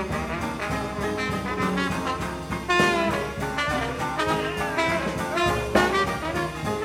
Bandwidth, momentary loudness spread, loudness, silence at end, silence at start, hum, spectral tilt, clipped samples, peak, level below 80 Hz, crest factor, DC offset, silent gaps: 17 kHz; 7 LU; -25 LUFS; 0 s; 0 s; none; -4.5 dB/octave; under 0.1%; -6 dBFS; -42 dBFS; 20 dB; under 0.1%; none